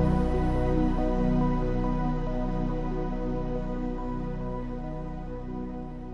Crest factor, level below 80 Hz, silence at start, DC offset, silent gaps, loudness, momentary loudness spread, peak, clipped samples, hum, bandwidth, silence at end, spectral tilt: 16 dB; -32 dBFS; 0 s; under 0.1%; none; -30 LUFS; 10 LU; -12 dBFS; under 0.1%; 60 Hz at -65 dBFS; 6.2 kHz; 0 s; -9.5 dB/octave